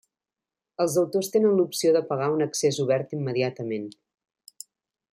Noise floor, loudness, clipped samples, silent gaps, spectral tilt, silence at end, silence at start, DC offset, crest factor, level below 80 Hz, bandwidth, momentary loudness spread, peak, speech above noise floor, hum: -90 dBFS; -25 LUFS; under 0.1%; none; -5 dB/octave; 1.2 s; 0.8 s; under 0.1%; 16 dB; -72 dBFS; 16 kHz; 21 LU; -10 dBFS; 66 dB; none